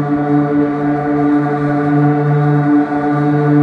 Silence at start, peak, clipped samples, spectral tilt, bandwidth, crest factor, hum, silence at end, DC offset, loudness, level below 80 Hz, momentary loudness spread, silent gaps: 0 s; -2 dBFS; under 0.1%; -10.5 dB/octave; 4.8 kHz; 10 dB; none; 0 s; under 0.1%; -14 LUFS; -48 dBFS; 3 LU; none